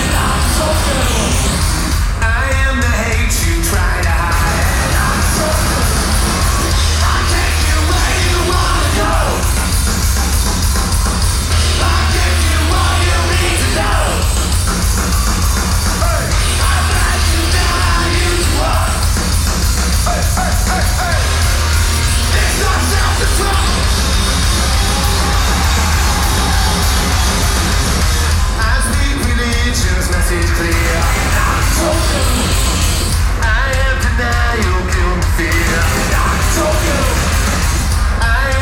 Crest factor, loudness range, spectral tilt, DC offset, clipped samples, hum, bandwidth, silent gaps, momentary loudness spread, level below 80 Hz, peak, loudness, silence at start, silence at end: 12 dB; 1 LU; -3.5 dB/octave; 0.3%; under 0.1%; none; 17 kHz; none; 2 LU; -16 dBFS; 0 dBFS; -14 LUFS; 0 s; 0 s